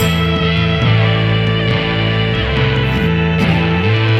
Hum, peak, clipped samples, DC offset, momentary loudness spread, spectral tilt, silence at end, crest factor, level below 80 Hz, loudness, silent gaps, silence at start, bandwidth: none; -2 dBFS; under 0.1%; under 0.1%; 2 LU; -6.5 dB/octave; 0 s; 12 dB; -28 dBFS; -14 LUFS; none; 0 s; 13.5 kHz